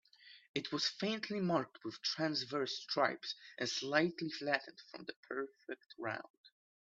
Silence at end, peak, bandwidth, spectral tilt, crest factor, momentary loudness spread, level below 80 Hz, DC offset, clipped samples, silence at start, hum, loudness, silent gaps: 0.4 s; -16 dBFS; 8 kHz; -4 dB/octave; 24 dB; 15 LU; -84 dBFS; under 0.1%; under 0.1%; 0.2 s; none; -38 LUFS; 0.48-0.54 s, 5.16-5.23 s, 6.30-6.44 s